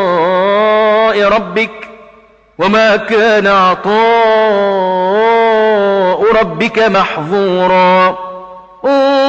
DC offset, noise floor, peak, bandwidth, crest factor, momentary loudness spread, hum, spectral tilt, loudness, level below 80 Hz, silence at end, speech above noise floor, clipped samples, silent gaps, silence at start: under 0.1%; -43 dBFS; -2 dBFS; 8 kHz; 10 dB; 7 LU; none; -5.5 dB/octave; -10 LUFS; -46 dBFS; 0 s; 33 dB; under 0.1%; none; 0 s